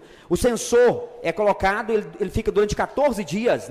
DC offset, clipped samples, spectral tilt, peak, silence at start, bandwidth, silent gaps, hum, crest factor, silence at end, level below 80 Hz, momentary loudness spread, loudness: under 0.1%; under 0.1%; -5 dB/octave; -10 dBFS; 0.3 s; 15.5 kHz; none; none; 10 dB; 0 s; -40 dBFS; 8 LU; -22 LUFS